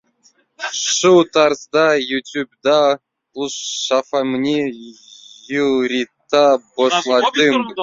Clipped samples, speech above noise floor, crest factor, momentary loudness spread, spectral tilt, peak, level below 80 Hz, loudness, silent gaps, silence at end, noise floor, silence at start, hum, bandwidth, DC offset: under 0.1%; 41 dB; 16 dB; 12 LU; -3 dB/octave; -2 dBFS; -62 dBFS; -17 LUFS; none; 0 s; -57 dBFS; 0.6 s; none; 7.8 kHz; under 0.1%